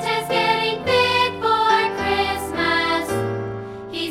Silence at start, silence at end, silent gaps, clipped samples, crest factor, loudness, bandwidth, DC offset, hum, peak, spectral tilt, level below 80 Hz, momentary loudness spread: 0 s; 0 s; none; under 0.1%; 16 dB; -19 LUFS; 17 kHz; under 0.1%; none; -6 dBFS; -4 dB/octave; -48 dBFS; 11 LU